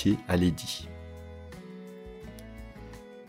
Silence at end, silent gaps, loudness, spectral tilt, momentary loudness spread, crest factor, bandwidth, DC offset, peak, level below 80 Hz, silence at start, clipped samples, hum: 0 s; none; -29 LUFS; -6 dB/octave; 19 LU; 20 dB; 16 kHz; under 0.1%; -12 dBFS; -50 dBFS; 0 s; under 0.1%; none